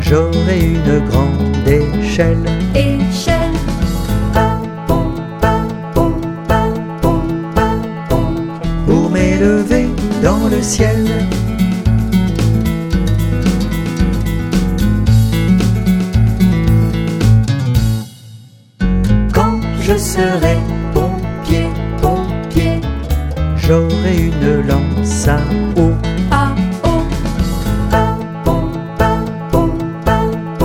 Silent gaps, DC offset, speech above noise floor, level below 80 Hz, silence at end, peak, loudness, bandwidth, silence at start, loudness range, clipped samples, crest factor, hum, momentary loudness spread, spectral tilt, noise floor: none; under 0.1%; 26 dB; -20 dBFS; 0 s; 0 dBFS; -15 LUFS; 17.5 kHz; 0 s; 3 LU; under 0.1%; 14 dB; none; 6 LU; -6.5 dB/octave; -38 dBFS